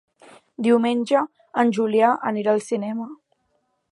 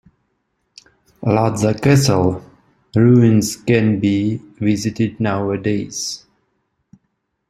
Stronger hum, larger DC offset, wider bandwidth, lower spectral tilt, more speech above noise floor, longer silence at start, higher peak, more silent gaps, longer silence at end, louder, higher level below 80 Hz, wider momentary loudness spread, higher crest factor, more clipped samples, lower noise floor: neither; neither; second, 11.5 kHz vs 14.5 kHz; about the same, -6 dB/octave vs -6 dB/octave; second, 50 dB vs 55 dB; second, 0.6 s vs 1.2 s; second, -4 dBFS vs 0 dBFS; neither; second, 0.75 s vs 1.3 s; second, -21 LUFS vs -17 LUFS; second, -78 dBFS vs -50 dBFS; about the same, 9 LU vs 11 LU; about the same, 18 dB vs 18 dB; neither; about the same, -70 dBFS vs -71 dBFS